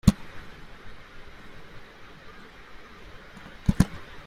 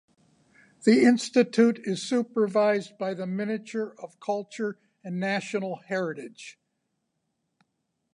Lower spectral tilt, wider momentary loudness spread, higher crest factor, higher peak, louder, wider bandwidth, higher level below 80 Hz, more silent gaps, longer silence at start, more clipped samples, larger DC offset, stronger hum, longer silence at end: about the same, -6.5 dB/octave vs -5.5 dB/octave; first, 23 LU vs 16 LU; first, 30 dB vs 20 dB; first, -2 dBFS vs -8 dBFS; about the same, -27 LUFS vs -26 LUFS; first, 16 kHz vs 11 kHz; first, -38 dBFS vs -80 dBFS; neither; second, 0.05 s vs 0.85 s; neither; neither; neither; second, 0 s vs 1.65 s